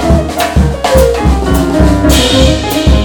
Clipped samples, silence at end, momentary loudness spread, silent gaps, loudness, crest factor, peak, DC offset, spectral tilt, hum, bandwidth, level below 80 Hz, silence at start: under 0.1%; 0 s; 4 LU; none; -9 LUFS; 8 dB; 0 dBFS; under 0.1%; -5.5 dB/octave; none; 19.5 kHz; -12 dBFS; 0 s